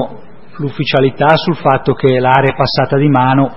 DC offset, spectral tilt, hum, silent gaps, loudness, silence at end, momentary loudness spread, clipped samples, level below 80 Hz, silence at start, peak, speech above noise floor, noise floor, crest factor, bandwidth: 3%; -9 dB/octave; none; none; -12 LUFS; 0 s; 9 LU; 0.1%; -42 dBFS; 0 s; 0 dBFS; 24 dB; -35 dBFS; 12 dB; 5.8 kHz